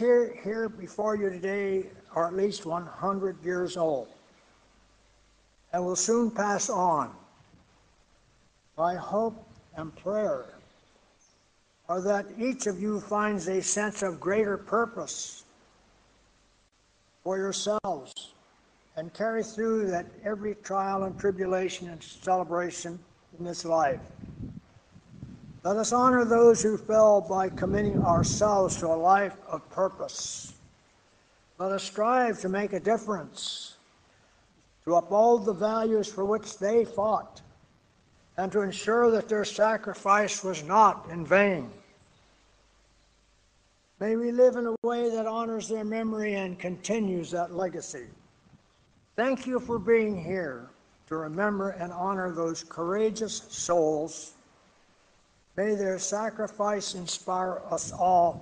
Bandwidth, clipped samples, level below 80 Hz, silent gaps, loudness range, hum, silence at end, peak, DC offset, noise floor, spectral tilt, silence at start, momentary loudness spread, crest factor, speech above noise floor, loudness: 10 kHz; under 0.1%; -58 dBFS; 44.78-44.82 s; 9 LU; none; 0 s; -8 dBFS; under 0.1%; -66 dBFS; -4.5 dB/octave; 0 s; 15 LU; 20 dB; 39 dB; -28 LUFS